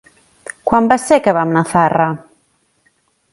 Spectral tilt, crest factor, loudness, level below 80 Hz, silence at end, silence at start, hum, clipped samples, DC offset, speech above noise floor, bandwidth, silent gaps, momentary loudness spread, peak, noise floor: -6 dB/octave; 16 dB; -14 LUFS; -50 dBFS; 1.1 s; 0.65 s; none; under 0.1%; under 0.1%; 47 dB; 11.5 kHz; none; 17 LU; 0 dBFS; -60 dBFS